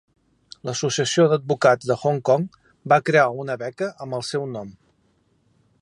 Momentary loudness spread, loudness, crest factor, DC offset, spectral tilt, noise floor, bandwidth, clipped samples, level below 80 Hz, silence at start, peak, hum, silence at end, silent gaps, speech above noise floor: 15 LU; -21 LUFS; 20 dB; under 0.1%; -5 dB/octave; -64 dBFS; 11.5 kHz; under 0.1%; -66 dBFS; 0.65 s; -2 dBFS; none; 1.1 s; none; 43 dB